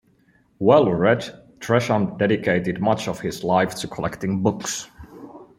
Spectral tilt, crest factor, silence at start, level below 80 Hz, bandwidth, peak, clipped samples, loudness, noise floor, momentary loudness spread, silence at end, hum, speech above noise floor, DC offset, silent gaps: -5.5 dB/octave; 20 dB; 0.6 s; -54 dBFS; 16 kHz; -2 dBFS; under 0.1%; -21 LUFS; -59 dBFS; 16 LU; 0.15 s; none; 39 dB; under 0.1%; none